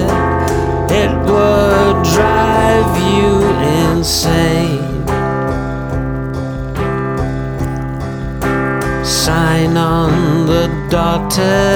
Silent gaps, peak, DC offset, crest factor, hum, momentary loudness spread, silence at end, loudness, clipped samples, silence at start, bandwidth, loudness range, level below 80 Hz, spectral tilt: none; 0 dBFS; under 0.1%; 12 dB; none; 9 LU; 0 s; -14 LUFS; under 0.1%; 0 s; over 20 kHz; 7 LU; -26 dBFS; -5.5 dB/octave